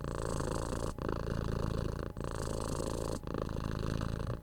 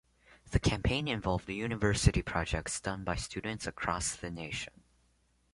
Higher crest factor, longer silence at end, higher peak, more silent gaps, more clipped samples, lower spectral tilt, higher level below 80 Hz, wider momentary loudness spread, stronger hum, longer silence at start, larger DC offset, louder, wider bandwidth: second, 18 dB vs 24 dB; second, 0 s vs 0.85 s; second, -20 dBFS vs -10 dBFS; neither; neither; first, -6 dB/octave vs -4.5 dB/octave; about the same, -42 dBFS vs -42 dBFS; second, 3 LU vs 9 LU; neither; second, 0 s vs 0.45 s; neither; second, -38 LUFS vs -33 LUFS; first, 18.5 kHz vs 11.5 kHz